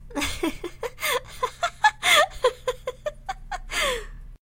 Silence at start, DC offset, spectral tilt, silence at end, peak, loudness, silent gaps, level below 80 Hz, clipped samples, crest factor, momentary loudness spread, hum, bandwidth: 0 s; under 0.1%; -1.5 dB/octave; 0.05 s; -4 dBFS; -24 LUFS; none; -42 dBFS; under 0.1%; 22 dB; 17 LU; none; 16.5 kHz